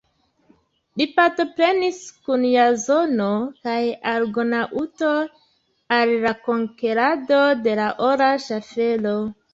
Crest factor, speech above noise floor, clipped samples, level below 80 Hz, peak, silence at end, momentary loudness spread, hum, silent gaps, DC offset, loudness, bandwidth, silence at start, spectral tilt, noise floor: 18 dB; 40 dB; under 0.1%; -64 dBFS; -4 dBFS; 0.2 s; 8 LU; none; none; under 0.1%; -20 LUFS; 7.8 kHz; 0.95 s; -4.5 dB/octave; -60 dBFS